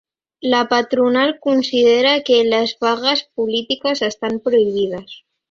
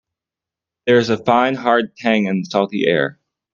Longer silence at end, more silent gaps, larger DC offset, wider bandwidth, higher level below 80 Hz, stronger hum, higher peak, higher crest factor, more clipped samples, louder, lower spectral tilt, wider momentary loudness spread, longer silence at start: about the same, 0.35 s vs 0.4 s; neither; neither; about the same, 7.4 kHz vs 7.4 kHz; about the same, -62 dBFS vs -62 dBFS; neither; about the same, -2 dBFS vs 0 dBFS; about the same, 16 dB vs 18 dB; neither; about the same, -17 LUFS vs -17 LUFS; second, -4 dB/octave vs -6 dB/octave; first, 7 LU vs 4 LU; second, 0.45 s vs 0.85 s